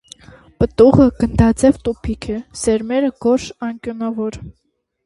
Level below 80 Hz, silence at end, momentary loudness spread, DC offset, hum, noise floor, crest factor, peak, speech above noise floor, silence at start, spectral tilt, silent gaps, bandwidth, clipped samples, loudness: -34 dBFS; 0.55 s; 15 LU; under 0.1%; none; -43 dBFS; 16 dB; 0 dBFS; 27 dB; 0.6 s; -7 dB/octave; none; 11.5 kHz; under 0.1%; -17 LUFS